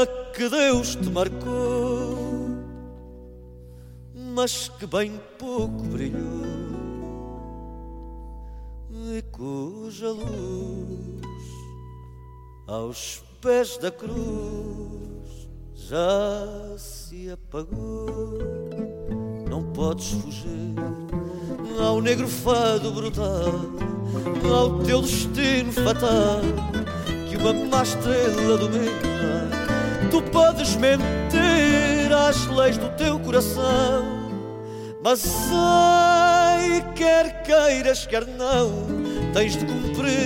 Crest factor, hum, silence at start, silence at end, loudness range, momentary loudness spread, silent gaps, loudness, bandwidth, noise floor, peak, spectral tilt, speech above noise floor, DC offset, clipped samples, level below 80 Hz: 16 dB; none; 0 s; 0 s; 14 LU; 19 LU; none; -23 LUFS; 17 kHz; -43 dBFS; -8 dBFS; -5 dB/octave; 21 dB; under 0.1%; under 0.1%; -38 dBFS